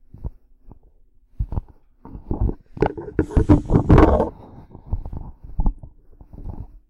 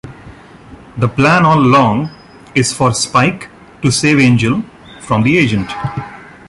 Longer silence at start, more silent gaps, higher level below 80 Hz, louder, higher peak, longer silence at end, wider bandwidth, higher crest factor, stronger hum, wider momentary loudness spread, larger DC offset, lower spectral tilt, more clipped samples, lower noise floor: first, 0.2 s vs 0.05 s; neither; first, -26 dBFS vs -42 dBFS; second, -21 LUFS vs -12 LUFS; about the same, -2 dBFS vs 0 dBFS; second, 0.1 s vs 0.25 s; second, 8.2 kHz vs 11.5 kHz; about the same, 18 dB vs 14 dB; neither; first, 23 LU vs 19 LU; neither; first, -9.5 dB/octave vs -5 dB/octave; neither; first, -52 dBFS vs -37 dBFS